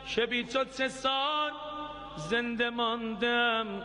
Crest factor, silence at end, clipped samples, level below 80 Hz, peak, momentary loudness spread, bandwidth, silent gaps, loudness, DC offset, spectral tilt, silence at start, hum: 16 dB; 0 s; under 0.1%; -60 dBFS; -16 dBFS; 12 LU; 10.5 kHz; none; -30 LUFS; under 0.1%; -3.5 dB/octave; 0 s; none